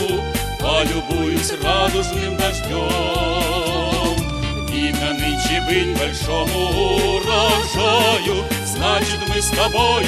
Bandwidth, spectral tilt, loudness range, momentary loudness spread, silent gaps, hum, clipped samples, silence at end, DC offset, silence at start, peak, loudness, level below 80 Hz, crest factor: 16 kHz; -4 dB/octave; 3 LU; 6 LU; none; none; under 0.1%; 0 s; under 0.1%; 0 s; -2 dBFS; -18 LUFS; -28 dBFS; 16 dB